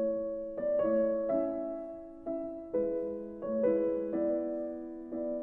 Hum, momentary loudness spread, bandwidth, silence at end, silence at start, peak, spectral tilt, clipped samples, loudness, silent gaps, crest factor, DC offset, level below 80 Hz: none; 11 LU; 3 kHz; 0 s; 0 s; -18 dBFS; -10.5 dB/octave; under 0.1%; -33 LUFS; none; 14 dB; under 0.1%; -64 dBFS